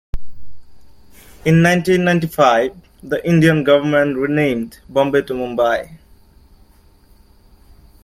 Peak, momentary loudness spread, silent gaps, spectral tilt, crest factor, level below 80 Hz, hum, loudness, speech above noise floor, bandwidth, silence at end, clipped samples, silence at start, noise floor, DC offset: 0 dBFS; 11 LU; none; -6.5 dB/octave; 16 dB; -40 dBFS; none; -16 LUFS; 34 dB; 15.5 kHz; 2.1 s; under 0.1%; 0.15 s; -49 dBFS; under 0.1%